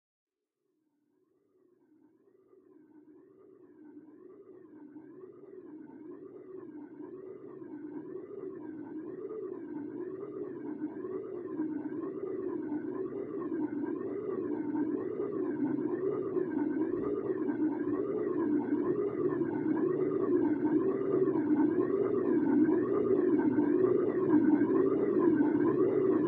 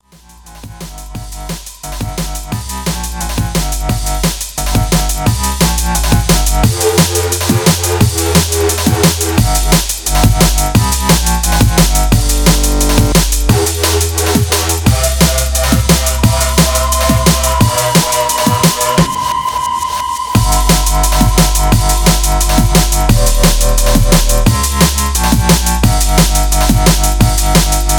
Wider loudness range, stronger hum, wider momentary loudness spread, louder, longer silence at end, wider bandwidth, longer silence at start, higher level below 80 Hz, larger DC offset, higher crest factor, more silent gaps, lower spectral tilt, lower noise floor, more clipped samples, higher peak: first, 20 LU vs 5 LU; neither; first, 19 LU vs 8 LU; second, -32 LUFS vs -11 LUFS; about the same, 0 s vs 0 s; second, 3 kHz vs over 20 kHz; first, 2.95 s vs 0.45 s; second, -74 dBFS vs -16 dBFS; neither; first, 18 dB vs 10 dB; neither; first, -11.5 dB/octave vs -4 dB/octave; first, -84 dBFS vs -39 dBFS; second, under 0.1% vs 0.1%; second, -16 dBFS vs 0 dBFS